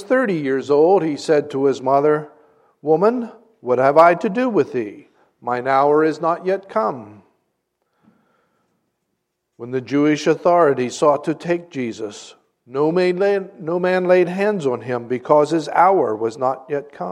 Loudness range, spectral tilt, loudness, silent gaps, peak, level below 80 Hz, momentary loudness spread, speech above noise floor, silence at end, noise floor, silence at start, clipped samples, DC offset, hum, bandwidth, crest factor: 7 LU; -6.5 dB/octave; -18 LUFS; none; 0 dBFS; -70 dBFS; 12 LU; 57 dB; 0 s; -74 dBFS; 0 s; under 0.1%; under 0.1%; none; 10.5 kHz; 18 dB